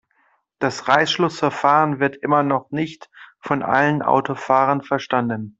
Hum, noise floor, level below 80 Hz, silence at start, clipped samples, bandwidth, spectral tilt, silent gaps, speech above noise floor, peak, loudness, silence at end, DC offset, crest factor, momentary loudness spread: none; -63 dBFS; -62 dBFS; 0.6 s; under 0.1%; 8 kHz; -5.5 dB/octave; none; 44 dB; -2 dBFS; -19 LUFS; 0.1 s; under 0.1%; 18 dB; 8 LU